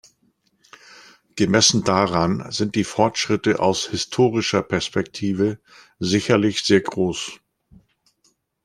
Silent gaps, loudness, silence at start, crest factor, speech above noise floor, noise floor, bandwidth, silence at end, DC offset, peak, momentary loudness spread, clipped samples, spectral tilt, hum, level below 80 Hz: none; -20 LUFS; 1.35 s; 20 dB; 45 dB; -65 dBFS; 13 kHz; 1.3 s; under 0.1%; 0 dBFS; 9 LU; under 0.1%; -4 dB/octave; none; -54 dBFS